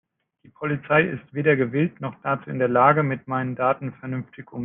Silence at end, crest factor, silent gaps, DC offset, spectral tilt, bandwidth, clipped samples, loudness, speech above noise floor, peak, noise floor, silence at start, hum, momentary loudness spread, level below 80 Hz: 0 s; 20 dB; none; under 0.1%; -11 dB/octave; 3.8 kHz; under 0.1%; -23 LUFS; 34 dB; -4 dBFS; -57 dBFS; 0.6 s; none; 14 LU; -66 dBFS